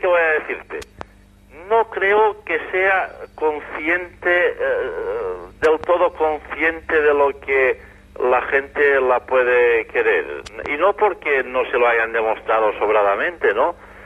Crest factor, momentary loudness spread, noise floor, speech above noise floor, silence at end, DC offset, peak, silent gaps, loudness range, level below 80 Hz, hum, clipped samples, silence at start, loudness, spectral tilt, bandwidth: 16 dB; 9 LU; -48 dBFS; 29 dB; 0 s; under 0.1%; -4 dBFS; none; 3 LU; -48 dBFS; 50 Hz at -50 dBFS; under 0.1%; 0 s; -18 LUFS; -5 dB/octave; 10.5 kHz